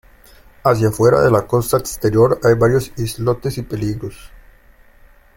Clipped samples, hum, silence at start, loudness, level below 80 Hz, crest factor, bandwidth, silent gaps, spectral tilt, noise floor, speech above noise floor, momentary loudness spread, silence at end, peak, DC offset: under 0.1%; none; 0.65 s; -16 LUFS; -40 dBFS; 16 dB; 17 kHz; none; -6.5 dB/octave; -47 dBFS; 32 dB; 10 LU; 1.1 s; -2 dBFS; under 0.1%